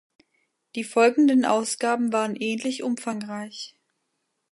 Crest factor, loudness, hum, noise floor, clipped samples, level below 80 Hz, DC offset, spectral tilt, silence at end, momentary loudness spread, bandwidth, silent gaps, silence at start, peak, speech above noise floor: 18 dB; -23 LUFS; none; -77 dBFS; under 0.1%; -78 dBFS; under 0.1%; -4 dB/octave; 0.85 s; 17 LU; 11.5 kHz; none; 0.75 s; -6 dBFS; 53 dB